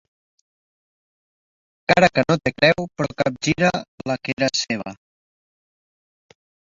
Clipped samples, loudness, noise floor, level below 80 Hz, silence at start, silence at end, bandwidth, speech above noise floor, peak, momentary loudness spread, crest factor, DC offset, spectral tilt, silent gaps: under 0.1%; -20 LUFS; under -90 dBFS; -52 dBFS; 1.9 s; 1.8 s; 7.8 kHz; over 70 dB; -2 dBFS; 12 LU; 22 dB; under 0.1%; -4.5 dB/octave; 3.88-3.98 s, 4.33-4.37 s